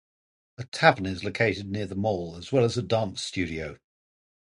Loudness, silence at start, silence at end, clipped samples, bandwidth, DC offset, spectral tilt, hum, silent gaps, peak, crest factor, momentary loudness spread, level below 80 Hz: -26 LUFS; 0.6 s; 0.8 s; under 0.1%; 11.5 kHz; under 0.1%; -5.5 dB/octave; none; 0.68-0.72 s; -4 dBFS; 24 dB; 13 LU; -52 dBFS